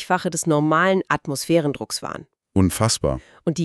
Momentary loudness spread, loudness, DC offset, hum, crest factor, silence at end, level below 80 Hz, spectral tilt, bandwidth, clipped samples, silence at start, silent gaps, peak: 10 LU; -21 LUFS; under 0.1%; none; 18 dB; 0 s; -44 dBFS; -5 dB/octave; 13.5 kHz; under 0.1%; 0 s; none; -4 dBFS